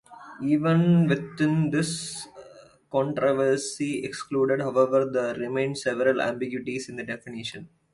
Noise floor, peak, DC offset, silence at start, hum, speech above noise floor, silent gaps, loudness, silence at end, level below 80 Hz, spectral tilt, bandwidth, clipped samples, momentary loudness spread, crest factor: -51 dBFS; -8 dBFS; under 0.1%; 0.1 s; none; 26 dB; none; -25 LUFS; 0.25 s; -64 dBFS; -6 dB/octave; 11.5 kHz; under 0.1%; 13 LU; 18 dB